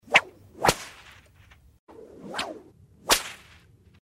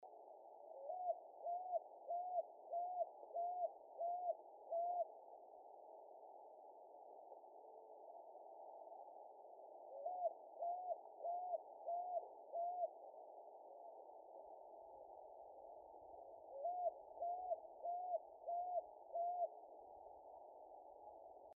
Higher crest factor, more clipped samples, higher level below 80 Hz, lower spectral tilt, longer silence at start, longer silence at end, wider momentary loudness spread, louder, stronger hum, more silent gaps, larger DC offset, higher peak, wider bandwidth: first, 26 dB vs 16 dB; neither; first, -54 dBFS vs under -90 dBFS; first, -1.5 dB/octave vs 13 dB/octave; about the same, 0.1 s vs 0 s; first, 0.65 s vs 0.05 s; first, 25 LU vs 16 LU; first, -25 LUFS vs -49 LUFS; neither; first, 1.79-1.87 s vs none; neither; first, -4 dBFS vs -32 dBFS; first, 16 kHz vs 1.2 kHz